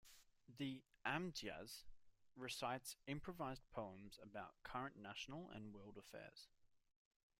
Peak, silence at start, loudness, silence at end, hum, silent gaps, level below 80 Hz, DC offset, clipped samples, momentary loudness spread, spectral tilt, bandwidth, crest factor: -30 dBFS; 0.05 s; -51 LUFS; 0.6 s; none; none; -74 dBFS; under 0.1%; under 0.1%; 14 LU; -4 dB/octave; 16 kHz; 24 dB